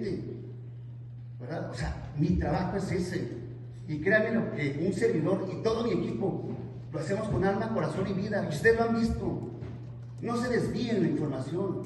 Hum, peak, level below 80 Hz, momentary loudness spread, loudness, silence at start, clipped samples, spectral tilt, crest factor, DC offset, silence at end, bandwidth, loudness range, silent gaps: none; -10 dBFS; -48 dBFS; 16 LU; -30 LUFS; 0 s; under 0.1%; -7 dB/octave; 20 dB; under 0.1%; 0 s; 12 kHz; 4 LU; none